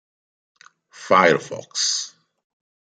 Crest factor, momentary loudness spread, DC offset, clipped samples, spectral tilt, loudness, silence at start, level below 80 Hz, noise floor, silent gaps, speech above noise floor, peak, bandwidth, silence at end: 22 dB; 18 LU; under 0.1%; under 0.1%; -2 dB/octave; -19 LUFS; 1 s; -70 dBFS; -45 dBFS; none; 26 dB; -2 dBFS; 10 kHz; 0.8 s